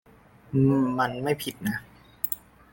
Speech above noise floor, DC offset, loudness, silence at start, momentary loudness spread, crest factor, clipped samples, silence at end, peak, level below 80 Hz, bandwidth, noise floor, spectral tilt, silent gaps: 29 dB; under 0.1%; -27 LUFS; 0.5 s; 10 LU; 20 dB; under 0.1%; 0.35 s; -8 dBFS; -58 dBFS; 17 kHz; -54 dBFS; -6.5 dB/octave; none